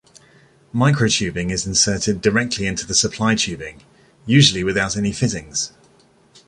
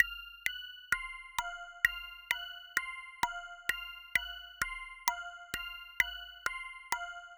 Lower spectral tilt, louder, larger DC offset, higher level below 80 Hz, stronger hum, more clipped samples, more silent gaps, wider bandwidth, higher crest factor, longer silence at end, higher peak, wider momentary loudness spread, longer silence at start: first, -3.5 dB/octave vs 0 dB/octave; first, -18 LUFS vs -36 LUFS; neither; first, -44 dBFS vs -60 dBFS; neither; neither; neither; second, 11 kHz vs 18 kHz; second, 20 dB vs 28 dB; first, 0.8 s vs 0 s; first, 0 dBFS vs -10 dBFS; about the same, 10 LU vs 11 LU; first, 0.75 s vs 0 s